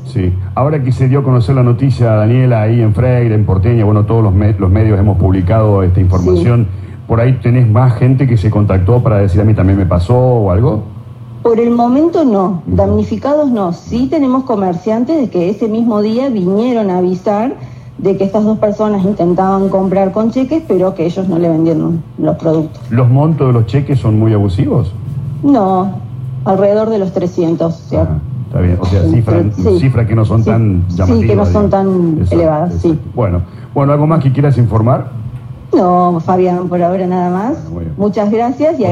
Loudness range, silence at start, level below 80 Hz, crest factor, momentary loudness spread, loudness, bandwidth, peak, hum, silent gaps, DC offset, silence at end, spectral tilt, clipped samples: 3 LU; 0 s; -38 dBFS; 10 dB; 6 LU; -12 LUFS; 7.4 kHz; 0 dBFS; none; none; under 0.1%; 0 s; -10 dB/octave; under 0.1%